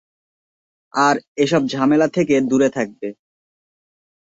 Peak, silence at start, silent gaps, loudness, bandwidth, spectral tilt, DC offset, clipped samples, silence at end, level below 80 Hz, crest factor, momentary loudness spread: -2 dBFS; 0.95 s; 1.28-1.35 s; -18 LUFS; 8 kHz; -5.5 dB/octave; under 0.1%; under 0.1%; 1.2 s; -60 dBFS; 18 dB; 10 LU